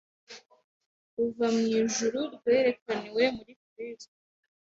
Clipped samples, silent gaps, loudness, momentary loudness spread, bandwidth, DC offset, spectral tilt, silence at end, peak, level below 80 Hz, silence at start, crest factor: under 0.1%; 0.64-0.80 s, 0.86-1.17 s, 2.82-2.86 s, 3.56-3.76 s; -28 LUFS; 23 LU; 8 kHz; under 0.1%; -3.5 dB/octave; 0.65 s; -10 dBFS; -70 dBFS; 0.3 s; 20 dB